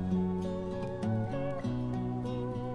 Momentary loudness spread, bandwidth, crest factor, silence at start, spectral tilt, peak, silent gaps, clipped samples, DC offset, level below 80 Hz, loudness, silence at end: 4 LU; 9.6 kHz; 12 dB; 0 s; -9 dB/octave; -20 dBFS; none; under 0.1%; under 0.1%; -52 dBFS; -35 LUFS; 0 s